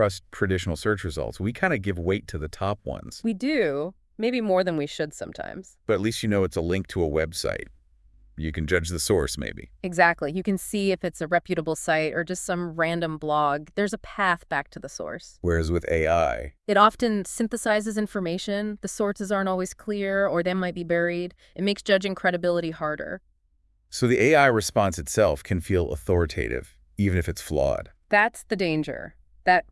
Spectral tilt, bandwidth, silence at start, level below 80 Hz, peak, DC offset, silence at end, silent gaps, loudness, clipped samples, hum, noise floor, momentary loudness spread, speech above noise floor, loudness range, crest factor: -5 dB/octave; 12 kHz; 0 s; -46 dBFS; -4 dBFS; under 0.1%; 0.1 s; none; -25 LUFS; under 0.1%; none; -65 dBFS; 12 LU; 40 dB; 4 LU; 22 dB